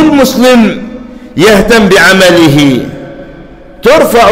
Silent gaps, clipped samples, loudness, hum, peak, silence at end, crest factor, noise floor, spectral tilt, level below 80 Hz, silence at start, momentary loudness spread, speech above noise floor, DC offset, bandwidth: none; 0.2%; -5 LUFS; none; 0 dBFS; 0 s; 6 dB; -29 dBFS; -4.5 dB/octave; -30 dBFS; 0 s; 19 LU; 25 dB; under 0.1%; 16.5 kHz